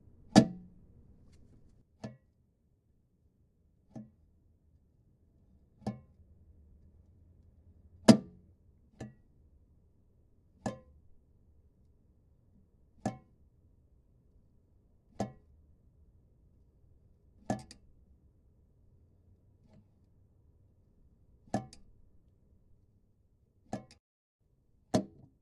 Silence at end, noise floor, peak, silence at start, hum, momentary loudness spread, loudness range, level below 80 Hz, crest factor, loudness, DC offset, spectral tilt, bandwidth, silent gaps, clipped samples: 0.35 s; -72 dBFS; -4 dBFS; 0.35 s; none; 28 LU; 23 LU; -64 dBFS; 34 dB; -32 LUFS; under 0.1%; -6 dB/octave; 10 kHz; 23.99-24.39 s; under 0.1%